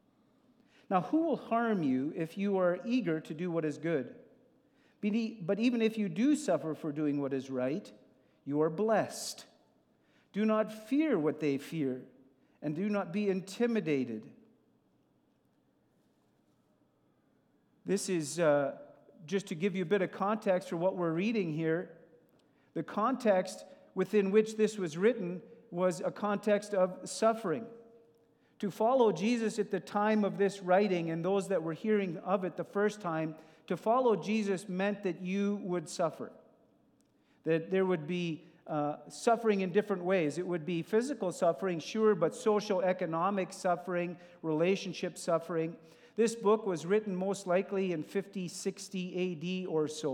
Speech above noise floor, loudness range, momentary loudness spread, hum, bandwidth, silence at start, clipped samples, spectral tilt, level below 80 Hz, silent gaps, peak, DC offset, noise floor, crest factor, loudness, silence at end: 40 dB; 4 LU; 10 LU; none; 15 kHz; 0.9 s; under 0.1%; -6 dB/octave; under -90 dBFS; none; -14 dBFS; under 0.1%; -72 dBFS; 18 dB; -33 LUFS; 0 s